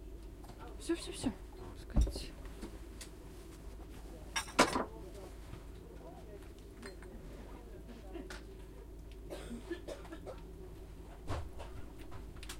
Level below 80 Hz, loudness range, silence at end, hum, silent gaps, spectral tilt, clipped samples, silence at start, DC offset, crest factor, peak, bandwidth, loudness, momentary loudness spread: -46 dBFS; 12 LU; 0 s; none; none; -4.5 dB/octave; under 0.1%; 0 s; under 0.1%; 30 dB; -12 dBFS; 16 kHz; -43 LUFS; 16 LU